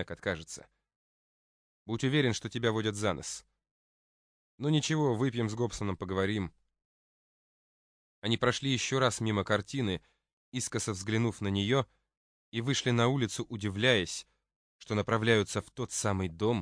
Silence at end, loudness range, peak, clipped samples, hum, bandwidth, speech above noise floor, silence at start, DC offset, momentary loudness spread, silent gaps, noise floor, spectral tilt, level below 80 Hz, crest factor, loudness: 0 s; 3 LU; -10 dBFS; under 0.1%; none; 10.5 kHz; over 59 dB; 0 s; under 0.1%; 12 LU; 0.96-1.86 s, 3.71-4.58 s, 6.85-8.22 s, 10.33-10.52 s, 12.17-12.52 s, 14.56-14.79 s; under -90 dBFS; -4.5 dB/octave; -62 dBFS; 22 dB; -31 LUFS